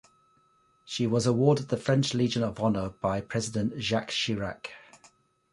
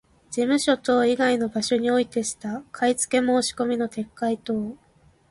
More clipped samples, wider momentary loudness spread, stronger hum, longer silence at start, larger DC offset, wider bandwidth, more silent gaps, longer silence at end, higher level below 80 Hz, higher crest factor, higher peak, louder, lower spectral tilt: neither; about the same, 9 LU vs 9 LU; neither; first, 0.85 s vs 0.3 s; neither; about the same, 11.5 kHz vs 11.5 kHz; neither; first, 0.75 s vs 0.55 s; about the same, -56 dBFS vs -60 dBFS; about the same, 20 dB vs 16 dB; about the same, -10 dBFS vs -8 dBFS; second, -28 LUFS vs -23 LUFS; first, -5.5 dB/octave vs -3.5 dB/octave